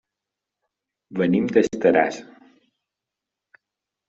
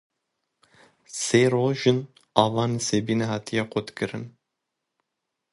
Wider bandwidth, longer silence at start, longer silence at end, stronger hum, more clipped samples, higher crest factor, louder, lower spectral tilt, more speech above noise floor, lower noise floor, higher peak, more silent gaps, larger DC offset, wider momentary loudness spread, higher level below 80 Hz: second, 8 kHz vs 11.5 kHz; about the same, 1.1 s vs 1.1 s; first, 1.85 s vs 1.25 s; neither; neither; about the same, 22 dB vs 26 dB; first, -20 LUFS vs -24 LUFS; about the same, -5.5 dB/octave vs -5 dB/octave; first, 66 dB vs 59 dB; first, -86 dBFS vs -82 dBFS; second, -4 dBFS vs 0 dBFS; neither; neither; about the same, 12 LU vs 11 LU; about the same, -64 dBFS vs -62 dBFS